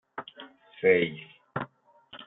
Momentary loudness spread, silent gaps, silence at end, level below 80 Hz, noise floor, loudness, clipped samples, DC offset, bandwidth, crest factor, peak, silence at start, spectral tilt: 25 LU; none; 0.05 s; -72 dBFS; -55 dBFS; -27 LUFS; under 0.1%; under 0.1%; 4 kHz; 22 dB; -8 dBFS; 0.15 s; -3.5 dB/octave